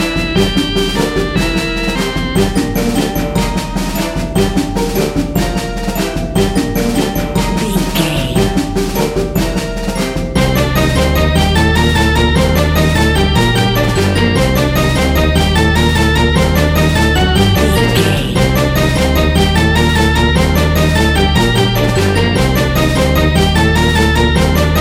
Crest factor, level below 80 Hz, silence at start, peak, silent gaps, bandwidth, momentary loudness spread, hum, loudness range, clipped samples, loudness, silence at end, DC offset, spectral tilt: 12 dB; -18 dBFS; 0 s; 0 dBFS; none; 16.5 kHz; 5 LU; none; 4 LU; under 0.1%; -13 LUFS; 0 s; under 0.1%; -5.5 dB/octave